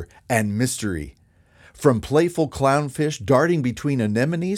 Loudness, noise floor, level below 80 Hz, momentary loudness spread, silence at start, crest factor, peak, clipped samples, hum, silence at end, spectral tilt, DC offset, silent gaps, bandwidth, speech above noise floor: -21 LUFS; -53 dBFS; -46 dBFS; 7 LU; 0 s; 20 dB; -2 dBFS; under 0.1%; none; 0 s; -6 dB/octave; under 0.1%; none; 16.5 kHz; 32 dB